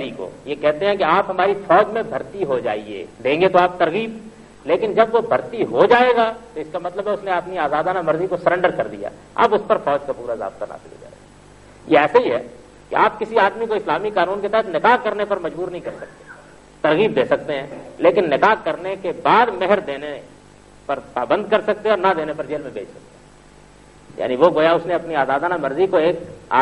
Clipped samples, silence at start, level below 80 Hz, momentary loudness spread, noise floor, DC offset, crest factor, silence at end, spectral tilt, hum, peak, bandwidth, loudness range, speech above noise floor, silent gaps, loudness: under 0.1%; 0 s; -54 dBFS; 14 LU; -46 dBFS; under 0.1%; 18 dB; 0 s; -6 dB/octave; none; 0 dBFS; 11 kHz; 4 LU; 27 dB; none; -19 LUFS